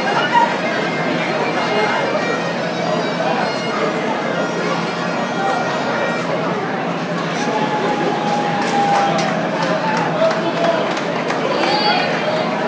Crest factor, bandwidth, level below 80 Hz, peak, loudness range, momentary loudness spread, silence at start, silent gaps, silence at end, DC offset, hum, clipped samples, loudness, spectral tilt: 16 dB; 8 kHz; -60 dBFS; -2 dBFS; 2 LU; 5 LU; 0 s; none; 0 s; under 0.1%; none; under 0.1%; -18 LUFS; -5 dB/octave